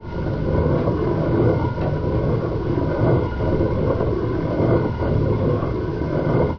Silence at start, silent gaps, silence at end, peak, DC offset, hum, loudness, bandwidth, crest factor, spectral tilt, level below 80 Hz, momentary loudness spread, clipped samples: 0 s; none; 0 s; -6 dBFS; under 0.1%; none; -21 LUFS; 5.4 kHz; 14 dB; -10.5 dB/octave; -30 dBFS; 4 LU; under 0.1%